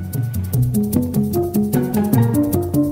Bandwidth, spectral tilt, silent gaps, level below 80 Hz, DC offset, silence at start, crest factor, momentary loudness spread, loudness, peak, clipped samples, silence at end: 16.5 kHz; -8 dB/octave; none; -40 dBFS; under 0.1%; 0 s; 16 dB; 4 LU; -18 LUFS; -2 dBFS; under 0.1%; 0 s